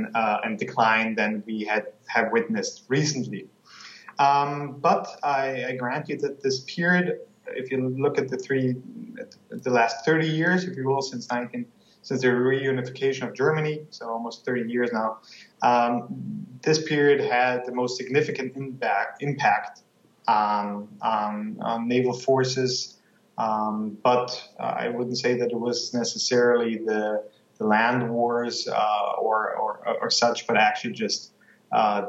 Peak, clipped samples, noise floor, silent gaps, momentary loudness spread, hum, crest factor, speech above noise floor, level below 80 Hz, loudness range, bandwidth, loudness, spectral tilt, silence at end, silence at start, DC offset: -6 dBFS; under 0.1%; -47 dBFS; none; 11 LU; none; 18 dB; 22 dB; -82 dBFS; 3 LU; 8 kHz; -25 LUFS; -4.5 dB/octave; 0 s; 0 s; under 0.1%